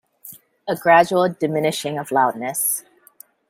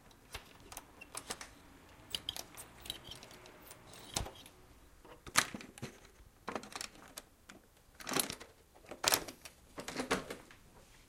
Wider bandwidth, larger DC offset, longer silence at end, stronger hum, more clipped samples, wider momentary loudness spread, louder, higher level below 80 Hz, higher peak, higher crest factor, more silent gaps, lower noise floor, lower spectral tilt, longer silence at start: about the same, 16.5 kHz vs 17 kHz; neither; first, 0.7 s vs 0 s; neither; neither; second, 22 LU vs 25 LU; first, -19 LUFS vs -40 LUFS; about the same, -66 dBFS vs -62 dBFS; about the same, -2 dBFS vs -4 dBFS; second, 20 dB vs 40 dB; neither; second, -50 dBFS vs -61 dBFS; first, -3.5 dB/octave vs -1.5 dB/octave; first, 0.25 s vs 0 s